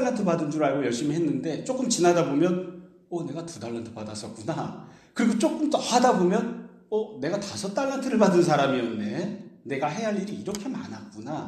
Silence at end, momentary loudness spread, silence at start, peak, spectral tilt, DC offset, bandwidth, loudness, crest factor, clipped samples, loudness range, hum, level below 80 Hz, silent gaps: 0 s; 15 LU; 0 s; -8 dBFS; -5 dB/octave; under 0.1%; 13 kHz; -26 LUFS; 18 dB; under 0.1%; 4 LU; none; -68 dBFS; none